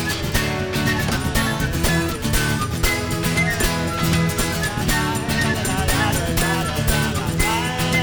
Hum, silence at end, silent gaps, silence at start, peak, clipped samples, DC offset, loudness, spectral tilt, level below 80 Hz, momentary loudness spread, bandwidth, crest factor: none; 0 s; none; 0 s; -4 dBFS; under 0.1%; under 0.1%; -20 LUFS; -4 dB/octave; -30 dBFS; 2 LU; over 20 kHz; 16 dB